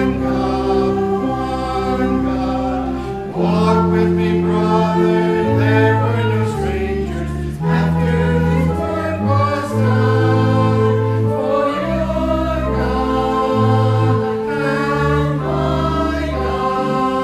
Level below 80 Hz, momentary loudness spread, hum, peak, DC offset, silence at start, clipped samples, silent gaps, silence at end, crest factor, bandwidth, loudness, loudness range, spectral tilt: -30 dBFS; 6 LU; none; 0 dBFS; under 0.1%; 0 s; under 0.1%; none; 0 s; 16 dB; 12 kHz; -17 LUFS; 3 LU; -8 dB/octave